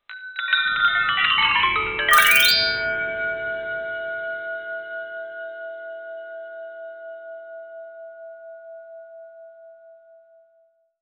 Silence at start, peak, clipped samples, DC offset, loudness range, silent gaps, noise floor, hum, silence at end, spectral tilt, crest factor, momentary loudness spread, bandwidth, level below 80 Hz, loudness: 0.1 s; -2 dBFS; under 0.1%; under 0.1%; 23 LU; none; -62 dBFS; none; 1.05 s; 0 dB/octave; 24 dB; 25 LU; over 20 kHz; -54 dBFS; -19 LUFS